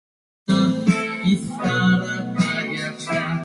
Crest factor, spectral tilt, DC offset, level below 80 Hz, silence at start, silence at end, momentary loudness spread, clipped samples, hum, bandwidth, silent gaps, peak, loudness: 18 dB; -6 dB/octave; under 0.1%; -54 dBFS; 0.5 s; 0 s; 7 LU; under 0.1%; none; 11.5 kHz; none; -4 dBFS; -21 LUFS